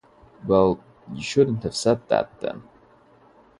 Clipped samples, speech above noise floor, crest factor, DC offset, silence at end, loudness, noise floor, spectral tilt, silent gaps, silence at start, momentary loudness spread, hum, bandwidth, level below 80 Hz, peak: under 0.1%; 32 dB; 20 dB; under 0.1%; 1 s; -23 LUFS; -54 dBFS; -5.5 dB/octave; none; 0.45 s; 16 LU; none; 11.5 kHz; -52 dBFS; -4 dBFS